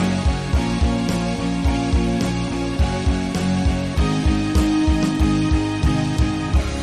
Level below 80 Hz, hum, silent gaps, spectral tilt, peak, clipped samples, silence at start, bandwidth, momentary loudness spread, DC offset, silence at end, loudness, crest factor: -24 dBFS; none; none; -6 dB/octave; -4 dBFS; under 0.1%; 0 s; 13 kHz; 3 LU; under 0.1%; 0 s; -20 LUFS; 14 dB